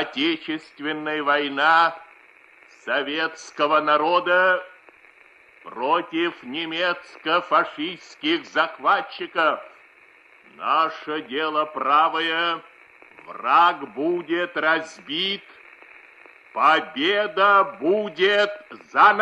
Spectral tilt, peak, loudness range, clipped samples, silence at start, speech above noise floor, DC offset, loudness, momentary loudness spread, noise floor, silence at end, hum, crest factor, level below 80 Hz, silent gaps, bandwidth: -4 dB/octave; -4 dBFS; 4 LU; under 0.1%; 0 s; 31 dB; under 0.1%; -22 LUFS; 13 LU; -53 dBFS; 0 s; none; 20 dB; -76 dBFS; none; 9.8 kHz